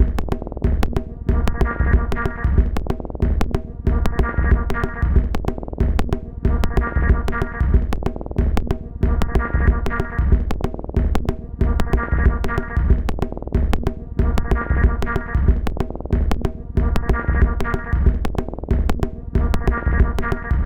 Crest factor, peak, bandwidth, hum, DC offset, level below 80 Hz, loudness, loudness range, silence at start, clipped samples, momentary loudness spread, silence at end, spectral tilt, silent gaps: 16 dB; -2 dBFS; 9.4 kHz; none; under 0.1%; -20 dBFS; -22 LUFS; 1 LU; 0 s; under 0.1%; 6 LU; 0 s; -8 dB/octave; none